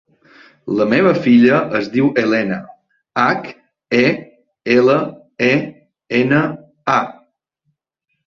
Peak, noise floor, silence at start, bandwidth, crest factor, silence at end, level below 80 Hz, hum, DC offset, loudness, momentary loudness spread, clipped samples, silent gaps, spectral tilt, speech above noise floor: -2 dBFS; -73 dBFS; 0.65 s; 7 kHz; 16 dB; 1.15 s; -58 dBFS; none; under 0.1%; -16 LUFS; 15 LU; under 0.1%; none; -7 dB/octave; 59 dB